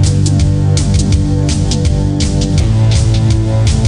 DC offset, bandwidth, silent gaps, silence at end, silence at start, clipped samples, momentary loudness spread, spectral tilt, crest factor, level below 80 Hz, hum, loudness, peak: under 0.1%; 10.5 kHz; none; 0 s; 0 s; under 0.1%; 2 LU; -6 dB/octave; 10 dB; -18 dBFS; none; -12 LUFS; 0 dBFS